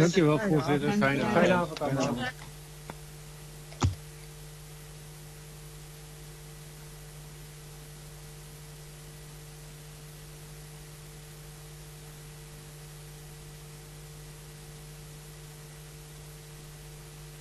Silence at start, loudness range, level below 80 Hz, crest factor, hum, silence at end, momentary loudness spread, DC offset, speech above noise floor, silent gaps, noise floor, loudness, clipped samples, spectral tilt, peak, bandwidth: 0 s; 17 LU; -52 dBFS; 22 dB; none; 0 s; 20 LU; under 0.1%; 20 dB; none; -46 dBFS; -28 LUFS; under 0.1%; -5.5 dB/octave; -10 dBFS; 13.5 kHz